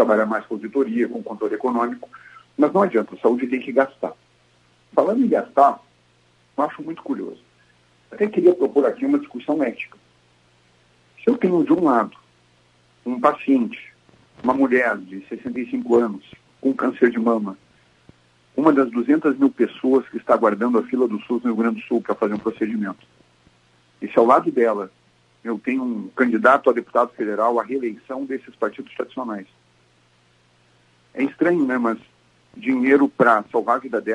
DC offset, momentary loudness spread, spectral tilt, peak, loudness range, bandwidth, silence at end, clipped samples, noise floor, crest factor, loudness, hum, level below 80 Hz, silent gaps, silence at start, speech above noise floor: under 0.1%; 14 LU; -7.5 dB/octave; 0 dBFS; 5 LU; 10.5 kHz; 0 s; under 0.1%; -59 dBFS; 20 dB; -20 LUFS; none; -70 dBFS; none; 0 s; 39 dB